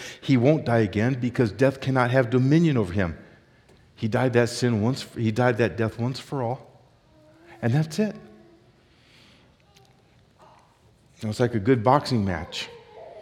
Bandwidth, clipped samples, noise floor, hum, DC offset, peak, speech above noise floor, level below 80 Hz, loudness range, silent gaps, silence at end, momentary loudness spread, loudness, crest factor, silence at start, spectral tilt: 13.5 kHz; under 0.1%; -58 dBFS; none; under 0.1%; -4 dBFS; 35 dB; -58 dBFS; 9 LU; none; 0 s; 13 LU; -24 LUFS; 20 dB; 0 s; -7 dB/octave